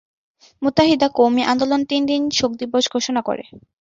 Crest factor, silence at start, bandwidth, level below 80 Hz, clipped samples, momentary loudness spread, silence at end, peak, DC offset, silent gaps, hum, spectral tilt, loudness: 18 dB; 0.6 s; 7.8 kHz; -52 dBFS; under 0.1%; 7 LU; 0.2 s; -2 dBFS; under 0.1%; none; none; -4 dB/octave; -18 LUFS